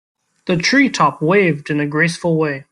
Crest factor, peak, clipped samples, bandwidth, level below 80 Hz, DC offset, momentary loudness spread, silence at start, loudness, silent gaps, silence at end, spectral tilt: 14 dB; -2 dBFS; under 0.1%; 11.5 kHz; -56 dBFS; under 0.1%; 7 LU; 0.45 s; -16 LUFS; none; 0.1 s; -5.5 dB/octave